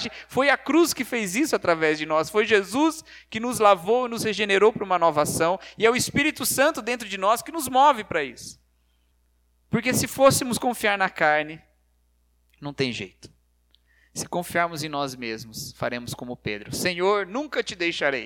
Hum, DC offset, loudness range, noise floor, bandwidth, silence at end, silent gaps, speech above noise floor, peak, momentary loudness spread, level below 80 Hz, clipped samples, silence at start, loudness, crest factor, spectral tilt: 60 Hz at -55 dBFS; under 0.1%; 8 LU; -65 dBFS; 19 kHz; 0 s; none; 42 dB; -4 dBFS; 14 LU; -58 dBFS; under 0.1%; 0 s; -23 LUFS; 20 dB; -3.5 dB/octave